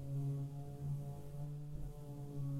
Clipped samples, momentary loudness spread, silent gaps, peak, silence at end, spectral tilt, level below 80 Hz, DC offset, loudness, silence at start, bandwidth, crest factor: under 0.1%; 8 LU; none; -32 dBFS; 0 s; -9 dB/octave; -56 dBFS; under 0.1%; -46 LUFS; 0 s; 14 kHz; 10 dB